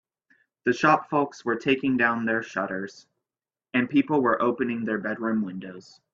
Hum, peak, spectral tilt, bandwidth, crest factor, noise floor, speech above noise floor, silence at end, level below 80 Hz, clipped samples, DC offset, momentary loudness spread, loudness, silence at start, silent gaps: none; -4 dBFS; -6 dB/octave; 7.4 kHz; 22 dB; under -90 dBFS; over 65 dB; 0.35 s; -66 dBFS; under 0.1%; under 0.1%; 10 LU; -25 LUFS; 0.65 s; none